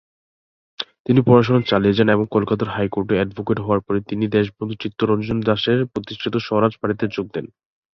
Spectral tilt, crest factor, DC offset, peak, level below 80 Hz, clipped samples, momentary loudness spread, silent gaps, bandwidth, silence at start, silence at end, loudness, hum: -8.5 dB/octave; 18 dB; under 0.1%; -2 dBFS; -48 dBFS; under 0.1%; 12 LU; 1.00-1.05 s; 6.4 kHz; 0.8 s; 0.5 s; -20 LUFS; none